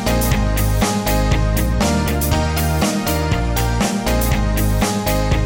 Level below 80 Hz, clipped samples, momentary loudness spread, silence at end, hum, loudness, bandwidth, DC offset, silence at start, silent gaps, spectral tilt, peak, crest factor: -22 dBFS; under 0.1%; 1 LU; 0 s; none; -18 LUFS; 17 kHz; under 0.1%; 0 s; none; -5 dB/octave; -6 dBFS; 10 dB